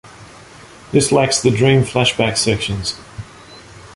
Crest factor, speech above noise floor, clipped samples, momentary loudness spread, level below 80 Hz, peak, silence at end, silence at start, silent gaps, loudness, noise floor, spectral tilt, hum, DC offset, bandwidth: 16 dB; 25 dB; under 0.1%; 19 LU; -42 dBFS; -2 dBFS; 0 s; 0.05 s; none; -15 LUFS; -40 dBFS; -4.5 dB/octave; none; under 0.1%; 11.5 kHz